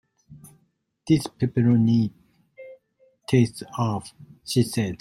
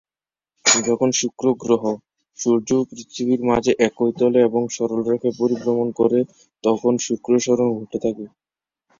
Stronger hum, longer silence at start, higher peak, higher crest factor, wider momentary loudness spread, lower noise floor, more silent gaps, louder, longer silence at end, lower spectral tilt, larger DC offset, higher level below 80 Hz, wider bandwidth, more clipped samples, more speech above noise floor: neither; second, 0.3 s vs 0.65 s; second, -6 dBFS vs 0 dBFS; about the same, 18 dB vs 20 dB; first, 22 LU vs 9 LU; second, -69 dBFS vs under -90 dBFS; neither; second, -23 LUFS vs -20 LUFS; second, 0.05 s vs 0.7 s; first, -7 dB/octave vs -4 dB/octave; neither; about the same, -58 dBFS vs -58 dBFS; first, 13.5 kHz vs 8 kHz; neither; second, 47 dB vs over 71 dB